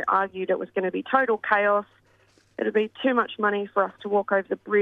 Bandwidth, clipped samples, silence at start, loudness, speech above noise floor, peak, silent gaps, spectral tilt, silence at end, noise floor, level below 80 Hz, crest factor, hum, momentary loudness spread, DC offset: 5 kHz; under 0.1%; 0 s; -24 LUFS; 37 dB; -6 dBFS; none; -7.5 dB/octave; 0 s; -61 dBFS; -72 dBFS; 20 dB; none; 6 LU; under 0.1%